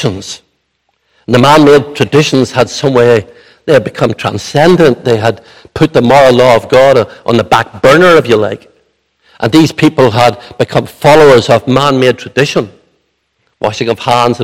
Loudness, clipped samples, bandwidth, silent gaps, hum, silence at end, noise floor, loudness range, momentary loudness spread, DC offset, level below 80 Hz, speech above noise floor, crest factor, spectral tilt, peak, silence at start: -8 LUFS; 4%; 16.5 kHz; none; none; 0 s; -61 dBFS; 3 LU; 12 LU; under 0.1%; -42 dBFS; 53 dB; 8 dB; -5.5 dB/octave; 0 dBFS; 0 s